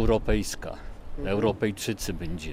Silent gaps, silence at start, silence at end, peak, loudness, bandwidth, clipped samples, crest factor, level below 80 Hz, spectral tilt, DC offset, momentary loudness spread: none; 0 s; 0 s; -10 dBFS; -29 LUFS; 16 kHz; under 0.1%; 18 dB; -34 dBFS; -5 dB/octave; under 0.1%; 14 LU